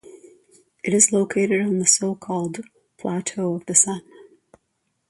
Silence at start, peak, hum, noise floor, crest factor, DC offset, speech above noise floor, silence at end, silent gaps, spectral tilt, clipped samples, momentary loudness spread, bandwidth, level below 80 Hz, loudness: 0.1 s; 0 dBFS; none; -73 dBFS; 24 dB; under 0.1%; 52 dB; 1.1 s; none; -3.5 dB/octave; under 0.1%; 15 LU; 11.5 kHz; -66 dBFS; -20 LUFS